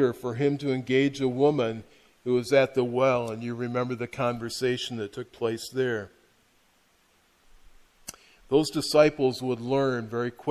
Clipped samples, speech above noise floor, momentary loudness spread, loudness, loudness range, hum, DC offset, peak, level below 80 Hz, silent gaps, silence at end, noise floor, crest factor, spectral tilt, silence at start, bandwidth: under 0.1%; 39 dB; 12 LU; -26 LUFS; 9 LU; none; under 0.1%; -6 dBFS; -62 dBFS; none; 0 s; -65 dBFS; 20 dB; -5.5 dB/octave; 0 s; 14 kHz